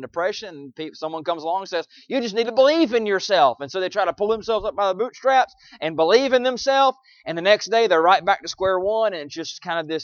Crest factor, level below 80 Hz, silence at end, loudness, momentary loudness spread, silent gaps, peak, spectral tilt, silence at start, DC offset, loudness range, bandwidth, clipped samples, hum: 18 dB; -58 dBFS; 0 s; -21 LUFS; 13 LU; none; -2 dBFS; -3.5 dB/octave; 0 s; under 0.1%; 2 LU; 7.2 kHz; under 0.1%; none